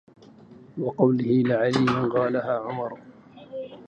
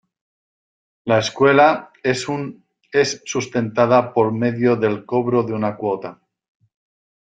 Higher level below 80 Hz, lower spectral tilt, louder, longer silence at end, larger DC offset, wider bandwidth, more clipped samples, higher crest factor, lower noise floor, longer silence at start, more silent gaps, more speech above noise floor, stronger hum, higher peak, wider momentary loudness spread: about the same, -64 dBFS vs -60 dBFS; first, -7.5 dB/octave vs -5.5 dB/octave; second, -24 LUFS vs -19 LUFS; second, 0.05 s vs 1.15 s; neither; about the same, 8.8 kHz vs 9.4 kHz; neither; about the same, 18 dB vs 18 dB; second, -49 dBFS vs under -90 dBFS; second, 0.5 s vs 1.05 s; neither; second, 26 dB vs over 72 dB; neither; second, -6 dBFS vs -2 dBFS; first, 17 LU vs 11 LU